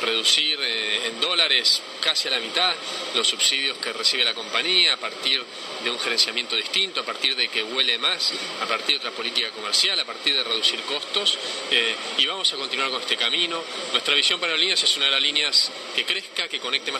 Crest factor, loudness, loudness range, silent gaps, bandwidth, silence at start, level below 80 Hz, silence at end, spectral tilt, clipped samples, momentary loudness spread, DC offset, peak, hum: 18 dB; -20 LUFS; 2 LU; none; 15.5 kHz; 0 s; -78 dBFS; 0 s; 0.5 dB/octave; under 0.1%; 7 LU; under 0.1%; -4 dBFS; none